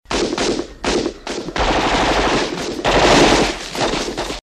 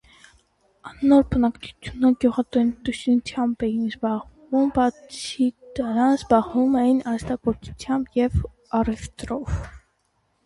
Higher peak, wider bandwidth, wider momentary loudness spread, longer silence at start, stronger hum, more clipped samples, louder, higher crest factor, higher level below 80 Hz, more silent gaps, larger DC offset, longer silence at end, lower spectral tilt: first, 0 dBFS vs -4 dBFS; first, 14 kHz vs 11.5 kHz; about the same, 11 LU vs 12 LU; second, 0.1 s vs 0.85 s; neither; neither; first, -17 LUFS vs -23 LUFS; about the same, 16 dB vs 18 dB; first, -30 dBFS vs -40 dBFS; neither; neither; second, 0.05 s vs 0.7 s; second, -3.5 dB/octave vs -6.5 dB/octave